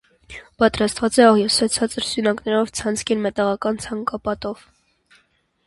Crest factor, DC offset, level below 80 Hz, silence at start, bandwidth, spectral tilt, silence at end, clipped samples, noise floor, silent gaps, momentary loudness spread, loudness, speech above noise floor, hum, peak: 20 dB; under 0.1%; -50 dBFS; 0.3 s; 11.5 kHz; -3.5 dB/octave; 1.15 s; under 0.1%; -62 dBFS; none; 16 LU; -20 LUFS; 43 dB; none; 0 dBFS